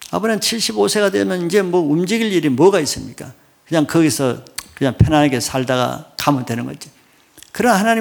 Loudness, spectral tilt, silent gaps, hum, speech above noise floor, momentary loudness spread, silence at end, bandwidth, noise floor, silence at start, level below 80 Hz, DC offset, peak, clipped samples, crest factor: -17 LUFS; -5 dB/octave; none; none; 31 dB; 14 LU; 0 s; 19.5 kHz; -47 dBFS; 0 s; -40 dBFS; under 0.1%; 0 dBFS; under 0.1%; 16 dB